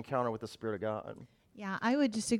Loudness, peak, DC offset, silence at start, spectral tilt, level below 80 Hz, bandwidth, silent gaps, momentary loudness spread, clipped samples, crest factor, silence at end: -35 LUFS; -18 dBFS; under 0.1%; 0 s; -5 dB/octave; -70 dBFS; 14.5 kHz; none; 15 LU; under 0.1%; 16 dB; 0 s